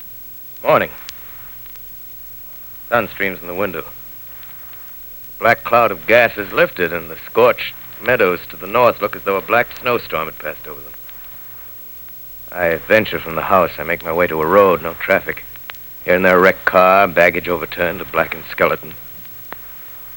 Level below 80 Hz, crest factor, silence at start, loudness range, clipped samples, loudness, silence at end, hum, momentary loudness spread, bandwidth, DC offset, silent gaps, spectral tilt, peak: -46 dBFS; 18 dB; 0 s; 9 LU; under 0.1%; -16 LUFS; 0 s; none; 18 LU; over 20 kHz; under 0.1%; none; -5.5 dB/octave; 0 dBFS